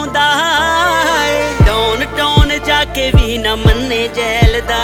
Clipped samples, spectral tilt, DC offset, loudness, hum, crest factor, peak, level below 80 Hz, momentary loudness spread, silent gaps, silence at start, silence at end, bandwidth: under 0.1%; -4.5 dB/octave; under 0.1%; -12 LUFS; none; 12 dB; 0 dBFS; -18 dBFS; 4 LU; none; 0 s; 0 s; 18 kHz